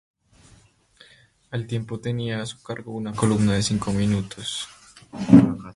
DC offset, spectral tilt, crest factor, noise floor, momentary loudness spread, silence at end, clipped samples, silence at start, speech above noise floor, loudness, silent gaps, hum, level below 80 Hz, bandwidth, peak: under 0.1%; -6 dB/octave; 24 dB; -56 dBFS; 18 LU; 0.05 s; under 0.1%; 1.5 s; 34 dB; -23 LUFS; none; none; -48 dBFS; 11.5 kHz; 0 dBFS